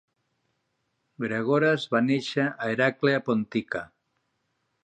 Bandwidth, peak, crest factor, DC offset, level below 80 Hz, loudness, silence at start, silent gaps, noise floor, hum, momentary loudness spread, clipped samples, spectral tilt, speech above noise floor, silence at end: 9.2 kHz; -8 dBFS; 20 dB; under 0.1%; -70 dBFS; -26 LUFS; 1.2 s; none; -76 dBFS; none; 11 LU; under 0.1%; -6.5 dB/octave; 51 dB; 1 s